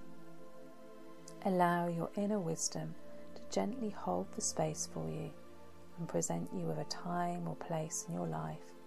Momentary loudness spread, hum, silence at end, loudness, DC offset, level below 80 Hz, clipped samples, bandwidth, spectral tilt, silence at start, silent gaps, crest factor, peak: 20 LU; none; 0 s; -38 LUFS; 0.3%; -70 dBFS; under 0.1%; 14 kHz; -4.5 dB/octave; 0 s; none; 20 dB; -18 dBFS